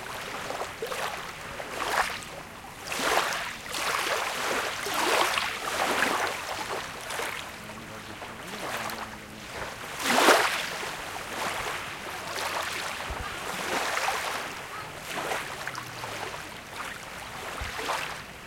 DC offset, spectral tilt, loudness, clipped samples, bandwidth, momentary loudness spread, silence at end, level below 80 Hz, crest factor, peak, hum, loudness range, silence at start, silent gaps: under 0.1%; -1.5 dB/octave; -30 LUFS; under 0.1%; 17 kHz; 13 LU; 0 s; -54 dBFS; 28 dB; -4 dBFS; none; 8 LU; 0 s; none